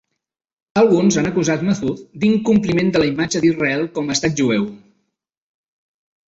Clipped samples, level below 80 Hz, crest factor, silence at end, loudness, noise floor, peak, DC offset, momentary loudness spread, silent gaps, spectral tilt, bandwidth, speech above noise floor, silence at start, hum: under 0.1%; -50 dBFS; 16 dB; 1.5 s; -17 LUFS; -78 dBFS; -2 dBFS; under 0.1%; 7 LU; none; -5 dB/octave; 8 kHz; 61 dB; 0.75 s; none